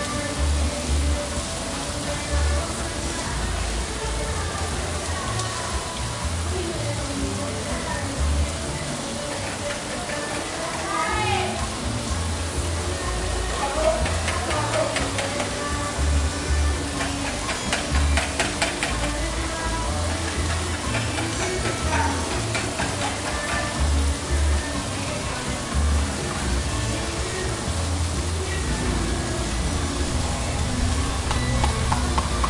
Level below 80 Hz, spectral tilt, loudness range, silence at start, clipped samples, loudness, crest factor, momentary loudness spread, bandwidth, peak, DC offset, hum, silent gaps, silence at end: -30 dBFS; -4 dB/octave; 3 LU; 0 s; under 0.1%; -25 LUFS; 18 dB; 4 LU; 11.5 kHz; -6 dBFS; under 0.1%; none; none; 0 s